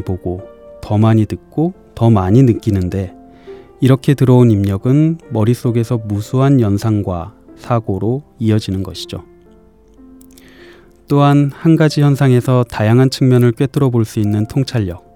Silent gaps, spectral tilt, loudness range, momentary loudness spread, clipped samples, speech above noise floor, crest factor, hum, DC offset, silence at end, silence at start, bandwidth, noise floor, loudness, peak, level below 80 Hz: none; -8 dB/octave; 8 LU; 11 LU; under 0.1%; 33 dB; 14 dB; none; 0.2%; 0.15 s; 0 s; 14.5 kHz; -45 dBFS; -14 LUFS; 0 dBFS; -46 dBFS